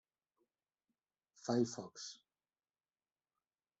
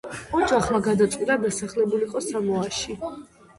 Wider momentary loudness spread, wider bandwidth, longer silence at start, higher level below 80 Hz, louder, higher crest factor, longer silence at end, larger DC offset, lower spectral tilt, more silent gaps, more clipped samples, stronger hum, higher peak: first, 14 LU vs 10 LU; second, 8.2 kHz vs 11.5 kHz; first, 1.4 s vs 0.05 s; second, -86 dBFS vs -50 dBFS; second, -41 LUFS vs -24 LUFS; first, 24 dB vs 16 dB; first, 1.65 s vs 0.35 s; neither; about the same, -5 dB/octave vs -4.5 dB/octave; neither; neither; neither; second, -22 dBFS vs -8 dBFS